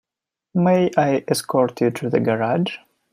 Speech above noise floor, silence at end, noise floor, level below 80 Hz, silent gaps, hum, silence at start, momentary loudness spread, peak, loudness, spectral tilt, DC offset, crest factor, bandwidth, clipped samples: 68 dB; 0.35 s; -87 dBFS; -64 dBFS; none; none; 0.55 s; 8 LU; -2 dBFS; -20 LUFS; -6 dB/octave; under 0.1%; 18 dB; 15.5 kHz; under 0.1%